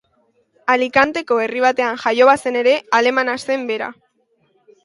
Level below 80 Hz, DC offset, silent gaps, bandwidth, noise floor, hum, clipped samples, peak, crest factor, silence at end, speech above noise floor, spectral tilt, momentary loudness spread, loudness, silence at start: -62 dBFS; under 0.1%; none; 11.5 kHz; -63 dBFS; none; under 0.1%; 0 dBFS; 18 dB; 0.9 s; 46 dB; -3 dB/octave; 9 LU; -16 LUFS; 0.65 s